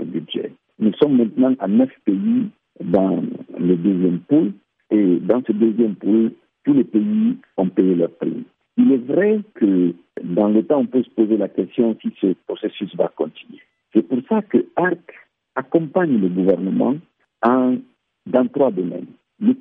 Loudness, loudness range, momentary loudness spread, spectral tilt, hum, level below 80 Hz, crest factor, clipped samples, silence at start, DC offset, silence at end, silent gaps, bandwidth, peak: -19 LUFS; 3 LU; 10 LU; -11 dB/octave; none; -66 dBFS; 16 dB; under 0.1%; 0 s; under 0.1%; 0.05 s; none; 3.8 kHz; -4 dBFS